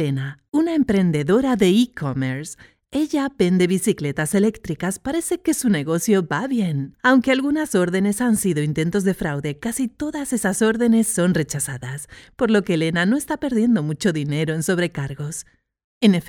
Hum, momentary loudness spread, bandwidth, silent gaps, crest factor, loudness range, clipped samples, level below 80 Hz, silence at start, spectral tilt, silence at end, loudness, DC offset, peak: none; 9 LU; 18 kHz; 15.84-16.01 s; 18 dB; 2 LU; under 0.1%; -50 dBFS; 0 s; -5.5 dB/octave; 0 s; -20 LUFS; under 0.1%; -4 dBFS